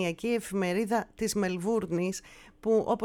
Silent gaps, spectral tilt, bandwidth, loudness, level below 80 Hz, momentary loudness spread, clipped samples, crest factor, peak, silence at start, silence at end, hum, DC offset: none; -5 dB/octave; 18 kHz; -30 LUFS; -58 dBFS; 5 LU; under 0.1%; 14 dB; -14 dBFS; 0 s; 0 s; none; under 0.1%